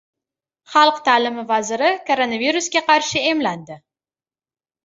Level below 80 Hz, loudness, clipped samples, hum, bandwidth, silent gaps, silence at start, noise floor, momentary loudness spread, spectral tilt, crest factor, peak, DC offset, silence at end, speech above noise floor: -64 dBFS; -18 LUFS; under 0.1%; none; 8 kHz; none; 0.7 s; under -90 dBFS; 7 LU; -2.5 dB/octave; 18 dB; -2 dBFS; under 0.1%; 1.1 s; over 72 dB